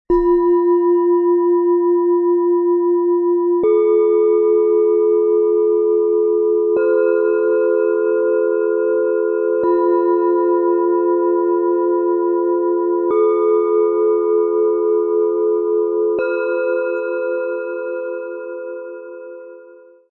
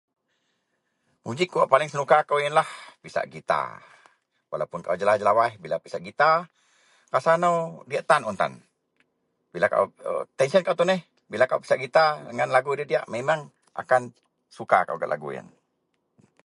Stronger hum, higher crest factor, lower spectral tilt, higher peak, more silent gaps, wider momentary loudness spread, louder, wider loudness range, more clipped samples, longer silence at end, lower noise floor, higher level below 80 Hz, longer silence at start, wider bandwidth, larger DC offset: neither; second, 10 dB vs 22 dB; first, -10 dB/octave vs -5 dB/octave; second, -6 dBFS vs -2 dBFS; neither; second, 8 LU vs 14 LU; first, -16 LUFS vs -24 LUFS; about the same, 5 LU vs 3 LU; neither; second, 0.4 s vs 1.05 s; second, -43 dBFS vs -75 dBFS; first, -50 dBFS vs -72 dBFS; second, 0.1 s vs 1.25 s; second, 2.7 kHz vs 11.5 kHz; neither